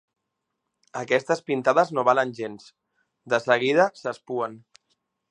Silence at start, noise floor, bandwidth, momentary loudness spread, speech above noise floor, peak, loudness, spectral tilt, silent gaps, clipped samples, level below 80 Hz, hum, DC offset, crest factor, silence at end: 0.95 s; -81 dBFS; 10 kHz; 14 LU; 57 dB; -4 dBFS; -23 LUFS; -5 dB/octave; none; under 0.1%; -78 dBFS; none; under 0.1%; 22 dB; 0.75 s